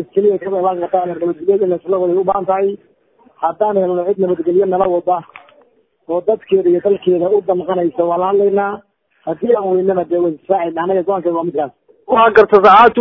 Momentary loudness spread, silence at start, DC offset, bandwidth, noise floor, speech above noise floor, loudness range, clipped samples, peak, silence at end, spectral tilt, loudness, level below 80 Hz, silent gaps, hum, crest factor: 11 LU; 0 s; under 0.1%; 6 kHz; -53 dBFS; 40 dB; 3 LU; 0.2%; 0 dBFS; 0 s; -8.5 dB/octave; -15 LUFS; -54 dBFS; none; none; 14 dB